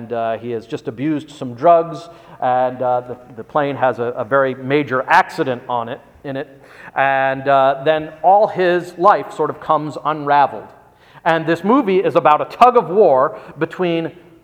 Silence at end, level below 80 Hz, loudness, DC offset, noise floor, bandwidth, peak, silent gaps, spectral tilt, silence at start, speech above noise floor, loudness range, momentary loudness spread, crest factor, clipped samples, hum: 0.3 s; -60 dBFS; -16 LUFS; under 0.1%; -41 dBFS; 13.5 kHz; 0 dBFS; none; -6.5 dB/octave; 0 s; 24 dB; 4 LU; 14 LU; 16 dB; under 0.1%; none